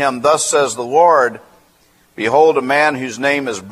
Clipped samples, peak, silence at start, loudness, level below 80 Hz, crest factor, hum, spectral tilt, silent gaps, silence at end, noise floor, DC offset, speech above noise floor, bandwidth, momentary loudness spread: under 0.1%; 0 dBFS; 0 s; -14 LUFS; -62 dBFS; 16 dB; none; -3 dB/octave; none; 0 s; -53 dBFS; under 0.1%; 39 dB; 14.5 kHz; 8 LU